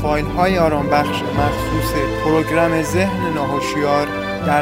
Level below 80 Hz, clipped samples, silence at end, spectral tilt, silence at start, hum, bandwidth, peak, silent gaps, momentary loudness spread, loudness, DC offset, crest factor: -32 dBFS; under 0.1%; 0 s; -6 dB/octave; 0 s; none; 16 kHz; -2 dBFS; none; 4 LU; -18 LUFS; under 0.1%; 16 dB